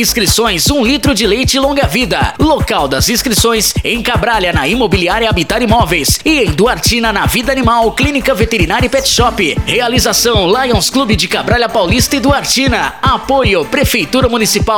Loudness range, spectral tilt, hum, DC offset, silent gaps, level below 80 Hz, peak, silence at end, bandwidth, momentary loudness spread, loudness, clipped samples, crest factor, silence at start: 1 LU; -3.5 dB/octave; none; 0.7%; none; -24 dBFS; 0 dBFS; 0 s; 19.5 kHz; 2 LU; -11 LUFS; under 0.1%; 12 dB; 0 s